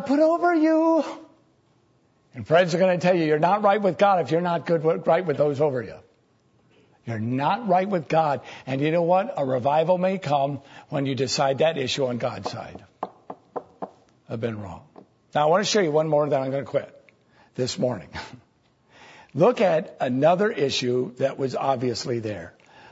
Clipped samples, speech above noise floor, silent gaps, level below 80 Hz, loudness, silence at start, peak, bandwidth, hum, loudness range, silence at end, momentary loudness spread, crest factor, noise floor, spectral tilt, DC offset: under 0.1%; 40 dB; none; -64 dBFS; -23 LUFS; 0 s; -6 dBFS; 8 kHz; none; 6 LU; 0.45 s; 18 LU; 18 dB; -63 dBFS; -5.5 dB/octave; under 0.1%